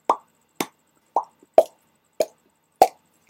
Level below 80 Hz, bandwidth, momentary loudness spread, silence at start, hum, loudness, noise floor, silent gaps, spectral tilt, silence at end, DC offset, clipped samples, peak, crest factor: -66 dBFS; 16.5 kHz; 12 LU; 0.1 s; none; -24 LUFS; -64 dBFS; none; -3 dB/octave; 0.4 s; under 0.1%; under 0.1%; 0 dBFS; 24 dB